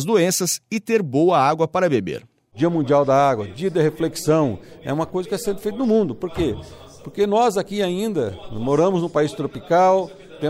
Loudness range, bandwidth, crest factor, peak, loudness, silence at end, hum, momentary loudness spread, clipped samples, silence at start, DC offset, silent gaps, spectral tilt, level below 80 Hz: 3 LU; 16 kHz; 16 dB; -4 dBFS; -20 LUFS; 0 s; none; 11 LU; under 0.1%; 0 s; under 0.1%; none; -5.5 dB/octave; -50 dBFS